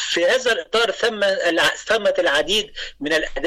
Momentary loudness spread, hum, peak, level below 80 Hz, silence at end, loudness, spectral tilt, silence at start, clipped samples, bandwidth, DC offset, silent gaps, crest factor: 4 LU; none; -10 dBFS; -44 dBFS; 0 s; -19 LUFS; -1.5 dB/octave; 0 s; under 0.1%; 16 kHz; under 0.1%; none; 10 dB